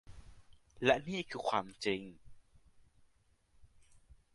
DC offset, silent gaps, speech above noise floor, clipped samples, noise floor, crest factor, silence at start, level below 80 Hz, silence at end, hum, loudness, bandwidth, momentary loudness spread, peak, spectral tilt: under 0.1%; none; 36 dB; under 0.1%; -71 dBFS; 26 dB; 0.1 s; -64 dBFS; 0.2 s; none; -35 LUFS; 11.5 kHz; 9 LU; -14 dBFS; -4.5 dB/octave